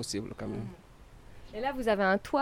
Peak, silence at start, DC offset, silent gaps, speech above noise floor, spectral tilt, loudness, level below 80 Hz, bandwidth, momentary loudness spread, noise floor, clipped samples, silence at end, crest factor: -16 dBFS; 0 s; under 0.1%; none; 21 dB; -5 dB/octave; -31 LUFS; -52 dBFS; 18 kHz; 15 LU; -52 dBFS; under 0.1%; 0 s; 18 dB